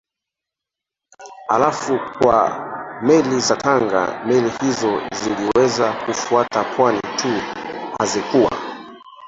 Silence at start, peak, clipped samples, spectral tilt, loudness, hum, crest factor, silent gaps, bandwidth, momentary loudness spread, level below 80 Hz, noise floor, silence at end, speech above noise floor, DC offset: 1.2 s; -2 dBFS; under 0.1%; -4 dB/octave; -18 LUFS; none; 18 dB; none; 8 kHz; 12 LU; -54 dBFS; -85 dBFS; 0 s; 67 dB; under 0.1%